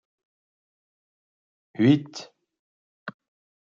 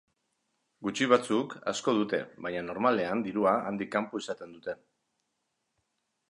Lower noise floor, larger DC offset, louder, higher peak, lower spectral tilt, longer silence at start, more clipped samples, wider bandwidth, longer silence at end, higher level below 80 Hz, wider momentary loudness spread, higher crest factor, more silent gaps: first, under -90 dBFS vs -81 dBFS; neither; first, -22 LUFS vs -30 LUFS; about the same, -6 dBFS vs -6 dBFS; first, -7 dB/octave vs -4.5 dB/octave; first, 1.8 s vs 0.8 s; neither; second, 7.4 kHz vs 11.5 kHz; second, 0.6 s vs 1.55 s; about the same, -76 dBFS vs -72 dBFS; first, 21 LU vs 14 LU; about the same, 22 dB vs 24 dB; first, 2.59-3.06 s vs none